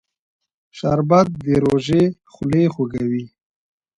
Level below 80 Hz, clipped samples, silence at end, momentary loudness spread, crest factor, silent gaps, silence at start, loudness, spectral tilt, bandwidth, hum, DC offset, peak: -48 dBFS; under 0.1%; 0.7 s; 9 LU; 18 dB; none; 0.75 s; -19 LUFS; -8 dB/octave; 11 kHz; none; under 0.1%; -2 dBFS